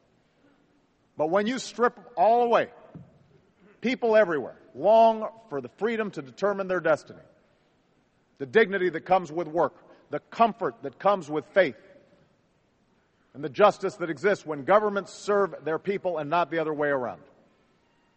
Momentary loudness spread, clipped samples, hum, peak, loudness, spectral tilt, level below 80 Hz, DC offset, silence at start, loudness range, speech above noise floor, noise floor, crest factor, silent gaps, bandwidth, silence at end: 12 LU; under 0.1%; none; -6 dBFS; -26 LUFS; -5.5 dB/octave; -72 dBFS; under 0.1%; 1.2 s; 4 LU; 42 dB; -67 dBFS; 22 dB; none; 8.4 kHz; 1 s